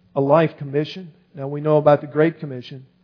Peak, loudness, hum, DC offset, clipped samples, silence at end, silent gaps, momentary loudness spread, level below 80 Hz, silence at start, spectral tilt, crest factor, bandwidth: -2 dBFS; -19 LUFS; none; under 0.1%; under 0.1%; 0.2 s; none; 19 LU; -70 dBFS; 0.15 s; -9 dB/octave; 18 dB; 5.4 kHz